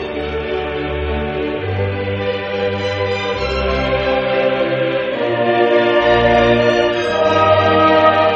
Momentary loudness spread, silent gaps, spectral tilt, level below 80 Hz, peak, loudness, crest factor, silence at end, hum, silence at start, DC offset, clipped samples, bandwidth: 9 LU; none; -6.5 dB/octave; -32 dBFS; 0 dBFS; -15 LUFS; 14 dB; 0 s; none; 0 s; under 0.1%; under 0.1%; 7.8 kHz